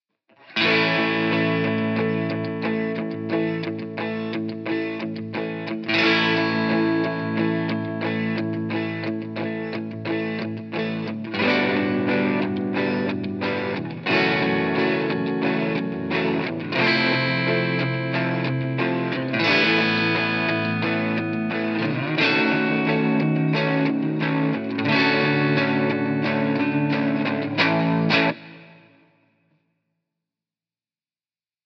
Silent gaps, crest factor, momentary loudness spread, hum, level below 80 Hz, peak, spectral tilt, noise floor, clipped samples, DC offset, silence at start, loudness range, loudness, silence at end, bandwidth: none; 16 dB; 9 LU; none; -74 dBFS; -6 dBFS; -7 dB/octave; under -90 dBFS; under 0.1%; under 0.1%; 0.5 s; 5 LU; -22 LUFS; 2.9 s; 6.4 kHz